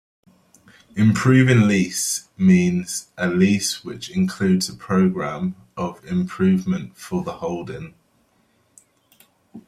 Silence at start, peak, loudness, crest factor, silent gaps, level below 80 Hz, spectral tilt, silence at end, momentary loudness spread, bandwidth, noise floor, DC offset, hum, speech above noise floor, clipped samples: 0.95 s; -4 dBFS; -20 LUFS; 18 dB; none; -56 dBFS; -5.5 dB/octave; 0.05 s; 14 LU; 14.5 kHz; -62 dBFS; under 0.1%; none; 43 dB; under 0.1%